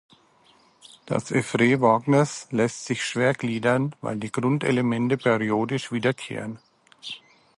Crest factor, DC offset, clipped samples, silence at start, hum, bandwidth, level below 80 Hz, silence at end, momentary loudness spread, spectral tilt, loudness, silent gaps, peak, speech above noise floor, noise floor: 18 dB; under 0.1%; under 0.1%; 1.05 s; none; 11.5 kHz; -64 dBFS; 0.4 s; 16 LU; -5.5 dB/octave; -24 LUFS; none; -6 dBFS; 35 dB; -59 dBFS